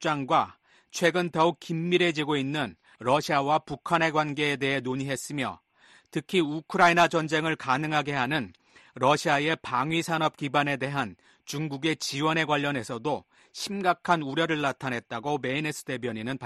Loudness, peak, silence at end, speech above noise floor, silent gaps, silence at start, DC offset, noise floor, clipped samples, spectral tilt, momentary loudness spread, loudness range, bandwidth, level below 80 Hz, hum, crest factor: -27 LUFS; -8 dBFS; 0 s; 30 dB; none; 0 s; under 0.1%; -57 dBFS; under 0.1%; -4.5 dB/octave; 9 LU; 3 LU; 13 kHz; -66 dBFS; none; 20 dB